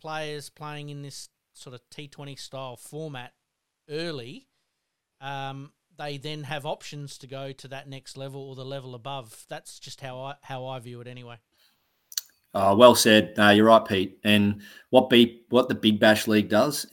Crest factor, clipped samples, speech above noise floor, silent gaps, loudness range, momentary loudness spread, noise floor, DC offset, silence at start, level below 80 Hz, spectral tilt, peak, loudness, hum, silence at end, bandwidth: 24 dB; under 0.1%; 56 dB; none; 19 LU; 23 LU; -80 dBFS; under 0.1%; 0.05 s; -68 dBFS; -4.5 dB/octave; 0 dBFS; -21 LUFS; none; 0.05 s; 18 kHz